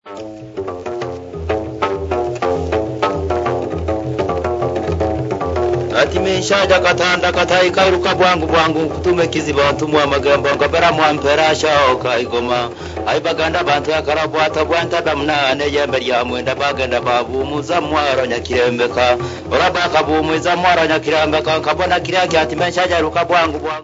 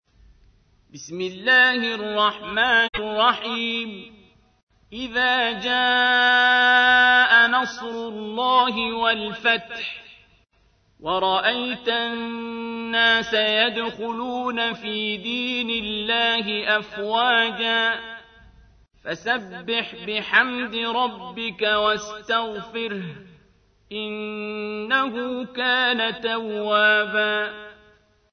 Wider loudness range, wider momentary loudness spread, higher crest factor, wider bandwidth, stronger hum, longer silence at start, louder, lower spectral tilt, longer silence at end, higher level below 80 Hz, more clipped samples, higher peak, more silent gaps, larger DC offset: second, 5 LU vs 8 LU; second, 8 LU vs 15 LU; about the same, 16 dB vs 20 dB; first, 8 kHz vs 6.6 kHz; neither; second, 0.05 s vs 0.95 s; first, -16 LUFS vs -21 LUFS; first, -4.5 dB/octave vs -3 dB/octave; second, 0 s vs 0.6 s; first, -36 dBFS vs -58 dBFS; neither; first, 0 dBFS vs -4 dBFS; second, none vs 4.63-4.67 s; neither